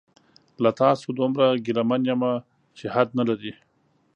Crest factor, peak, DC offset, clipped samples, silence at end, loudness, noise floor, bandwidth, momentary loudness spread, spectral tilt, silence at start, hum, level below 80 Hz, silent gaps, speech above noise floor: 20 dB; -4 dBFS; under 0.1%; under 0.1%; 0.65 s; -23 LUFS; -66 dBFS; 8.8 kHz; 10 LU; -7.5 dB/octave; 0.6 s; none; -70 dBFS; none; 43 dB